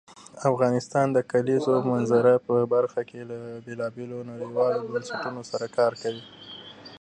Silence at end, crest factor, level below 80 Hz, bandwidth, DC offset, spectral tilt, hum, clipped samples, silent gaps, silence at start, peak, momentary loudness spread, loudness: 0.05 s; 18 dB; -70 dBFS; 9.6 kHz; under 0.1%; -6.5 dB/octave; none; under 0.1%; none; 0.1 s; -8 dBFS; 16 LU; -25 LUFS